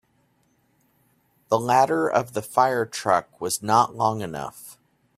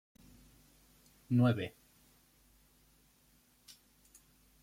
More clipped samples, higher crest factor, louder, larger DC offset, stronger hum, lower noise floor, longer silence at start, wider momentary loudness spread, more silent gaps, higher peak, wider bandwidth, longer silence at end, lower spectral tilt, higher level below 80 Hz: neither; about the same, 20 dB vs 22 dB; first, -23 LUFS vs -33 LUFS; neither; neither; about the same, -66 dBFS vs -69 dBFS; first, 1.5 s vs 1.3 s; second, 14 LU vs 28 LU; neither; first, -4 dBFS vs -18 dBFS; about the same, 16 kHz vs 16 kHz; second, 0.45 s vs 2.95 s; second, -4.5 dB/octave vs -8 dB/octave; first, -64 dBFS vs -70 dBFS